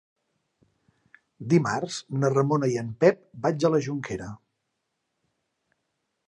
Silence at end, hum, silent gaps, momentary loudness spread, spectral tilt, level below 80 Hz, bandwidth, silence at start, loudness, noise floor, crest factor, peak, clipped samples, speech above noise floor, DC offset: 1.95 s; none; none; 12 LU; -6.5 dB/octave; -64 dBFS; 11 kHz; 1.4 s; -25 LUFS; -79 dBFS; 22 dB; -6 dBFS; under 0.1%; 55 dB; under 0.1%